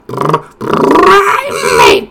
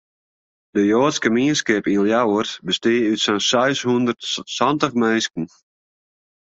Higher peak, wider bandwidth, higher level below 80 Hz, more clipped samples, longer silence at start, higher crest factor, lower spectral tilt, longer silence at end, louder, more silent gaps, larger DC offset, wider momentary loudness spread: about the same, 0 dBFS vs -2 dBFS; first, over 20 kHz vs 8.2 kHz; first, -38 dBFS vs -60 dBFS; first, 5% vs under 0.1%; second, 0.1 s vs 0.75 s; second, 8 dB vs 18 dB; about the same, -4 dB/octave vs -4 dB/octave; second, 0.05 s vs 1.1 s; first, -8 LUFS vs -19 LUFS; neither; neither; about the same, 9 LU vs 7 LU